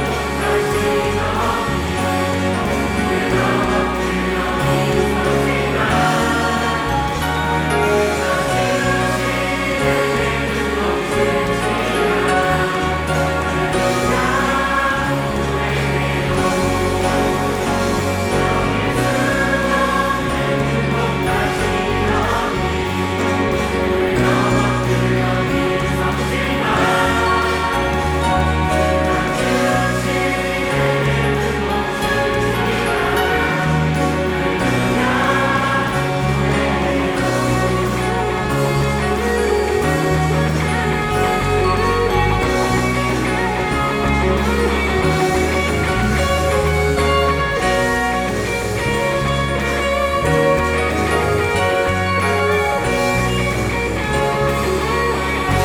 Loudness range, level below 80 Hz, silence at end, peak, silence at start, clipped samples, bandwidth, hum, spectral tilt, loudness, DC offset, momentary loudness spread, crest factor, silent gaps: 1 LU; -30 dBFS; 0 s; -4 dBFS; 0 s; under 0.1%; 19 kHz; none; -5 dB/octave; -17 LUFS; under 0.1%; 3 LU; 14 dB; none